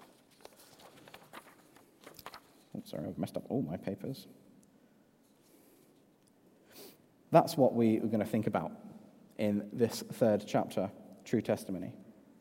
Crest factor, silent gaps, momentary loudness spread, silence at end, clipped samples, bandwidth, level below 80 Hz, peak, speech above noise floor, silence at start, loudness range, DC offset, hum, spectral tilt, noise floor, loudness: 26 dB; none; 26 LU; 0.3 s; under 0.1%; 16 kHz; -76 dBFS; -10 dBFS; 34 dB; 0.85 s; 14 LU; under 0.1%; none; -6.5 dB/octave; -66 dBFS; -33 LUFS